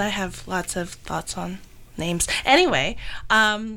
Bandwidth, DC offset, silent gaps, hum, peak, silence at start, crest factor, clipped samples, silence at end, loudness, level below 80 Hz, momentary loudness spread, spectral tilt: 18 kHz; under 0.1%; none; none; -6 dBFS; 0 s; 18 dB; under 0.1%; 0 s; -22 LUFS; -42 dBFS; 16 LU; -3 dB/octave